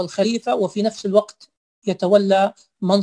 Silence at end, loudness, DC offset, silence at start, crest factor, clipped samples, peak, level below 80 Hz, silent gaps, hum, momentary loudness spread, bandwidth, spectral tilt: 0 s; -20 LUFS; under 0.1%; 0 s; 18 dB; under 0.1%; -2 dBFS; -66 dBFS; 1.57-1.82 s; none; 11 LU; 10.5 kHz; -6 dB/octave